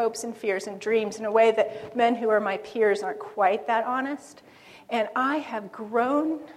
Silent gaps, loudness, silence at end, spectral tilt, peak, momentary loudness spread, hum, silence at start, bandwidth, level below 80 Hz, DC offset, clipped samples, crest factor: none; -25 LUFS; 0 s; -4 dB/octave; -8 dBFS; 9 LU; none; 0 s; 13 kHz; -74 dBFS; under 0.1%; under 0.1%; 18 dB